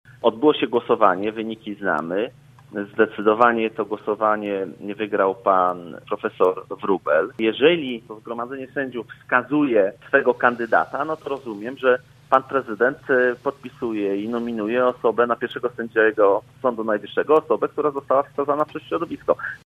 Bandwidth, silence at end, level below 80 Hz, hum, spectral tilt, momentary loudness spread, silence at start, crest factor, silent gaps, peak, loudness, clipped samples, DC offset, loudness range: 6.4 kHz; 0.1 s; -64 dBFS; none; -7 dB/octave; 12 LU; 0.25 s; 22 dB; none; 0 dBFS; -22 LUFS; under 0.1%; under 0.1%; 2 LU